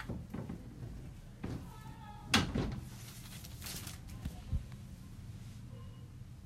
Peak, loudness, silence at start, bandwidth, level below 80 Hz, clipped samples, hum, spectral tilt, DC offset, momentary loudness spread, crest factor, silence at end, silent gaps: -14 dBFS; -42 LUFS; 0 s; 16 kHz; -50 dBFS; under 0.1%; none; -4 dB/octave; under 0.1%; 18 LU; 28 dB; 0 s; none